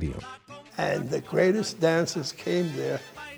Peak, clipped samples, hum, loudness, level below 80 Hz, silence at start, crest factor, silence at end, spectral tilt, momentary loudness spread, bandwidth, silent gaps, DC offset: -10 dBFS; under 0.1%; none; -27 LUFS; -50 dBFS; 0 s; 16 dB; 0 s; -5 dB/octave; 16 LU; over 20 kHz; none; under 0.1%